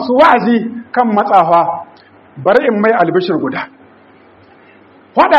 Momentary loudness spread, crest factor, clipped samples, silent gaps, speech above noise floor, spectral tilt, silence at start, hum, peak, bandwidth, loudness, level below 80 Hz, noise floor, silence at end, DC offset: 11 LU; 12 dB; 0.2%; none; 32 dB; -7.5 dB/octave; 0 s; none; 0 dBFS; 7.4 kHz; -12 LUFS; -54 dBFS; -44 dBFS; 0 s; under 0.1%